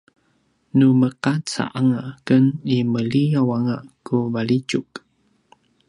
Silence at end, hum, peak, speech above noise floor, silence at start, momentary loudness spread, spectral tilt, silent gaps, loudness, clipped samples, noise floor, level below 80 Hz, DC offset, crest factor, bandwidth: 0.9 s; none; -4 dBFS; 45 dB; 0.75 s; 10 LU; -7 dB/octave; none; -20 LUFS; under 0.1%; -64 dBFS; -62 dBFS; under 0.1%; 18 dB; 11 kHz